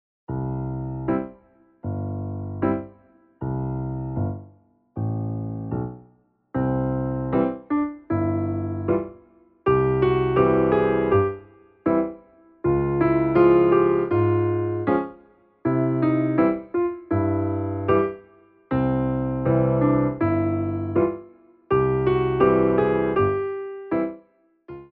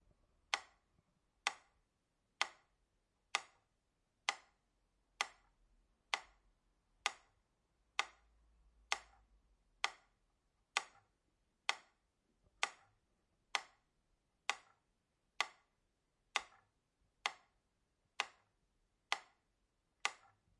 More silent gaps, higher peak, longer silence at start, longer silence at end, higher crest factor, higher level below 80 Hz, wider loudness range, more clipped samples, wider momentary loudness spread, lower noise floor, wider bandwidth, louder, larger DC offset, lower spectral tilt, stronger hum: neither; first, -6 dBFS vs -14 dBFS; second, 0.3 s vs 0.5 s; second, 0.05 s vs 0.45 s; second, 18 dB vs 34 dB; first, -44 dBFS vs -80 dBFS; first, 9 LU vs 2 LU; neither; first, 12 LU vs 9 LU; second, -59 dBFS vs -84 dBFS; second, 4.4 kHz vs 11.5 kHz; first, -23 LUFS vs -44 LUFS; neither; first, -8.5 dB/octave vs 2 dB/octave; neither